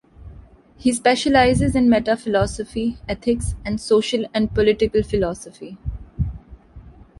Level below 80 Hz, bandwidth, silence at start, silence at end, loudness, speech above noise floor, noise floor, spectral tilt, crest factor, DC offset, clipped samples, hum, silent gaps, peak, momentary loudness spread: -34 dBFS; 11.5 kHz; 0.2 s; 0.3 s; -20 LUFS; 26 dB; -45 dBFS; -5.5 dB/octave; 16 dB; under 0.1%; under 0.1%; none; none; -4 dBFS; 14 LU